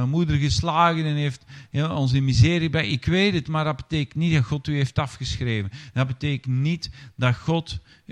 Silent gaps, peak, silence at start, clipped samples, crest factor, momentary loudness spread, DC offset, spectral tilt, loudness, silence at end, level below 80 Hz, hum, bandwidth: none; -4 dBFS; 0 s; under 0.1%; 18 dB; 9 LU; under 0.1%; -6 dB/octave; -23 LUFS; 0 s; -42 dBFS; none; 9.8 kHz